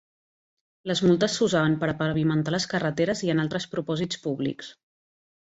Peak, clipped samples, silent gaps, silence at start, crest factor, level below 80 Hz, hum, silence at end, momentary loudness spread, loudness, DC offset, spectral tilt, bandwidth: -10 dBFS; under 0.1%; none; 0.85 s; 16 dB; -60 dBFS; none; 0.85 s; 8 LU; -25 LUFS; under 0.1%; -5.5 dB/octave; 8 kHz